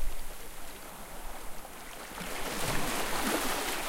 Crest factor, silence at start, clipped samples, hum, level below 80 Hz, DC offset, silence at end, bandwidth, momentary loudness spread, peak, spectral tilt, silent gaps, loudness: 16 dB; 0 s; under 0.1%; none; -42 dBFS; under 0.1%; 0 s; 16 kHz; 14 LU; -16 dBFS; -2.5 dB/octave; none; -36 LUFS